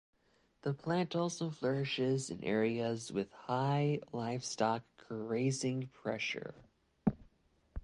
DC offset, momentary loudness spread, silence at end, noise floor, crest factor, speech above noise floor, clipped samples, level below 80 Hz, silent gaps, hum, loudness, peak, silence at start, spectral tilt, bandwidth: under 0.1%; 7 LU; 0 s; -73 dBFS; 20 dB; 37 dB; under 0.1%; -60 dBFS; none; none; -36 LUFS; -18 dBFS; 0.65 s; -5.5 dB/octave; 11.5 kHz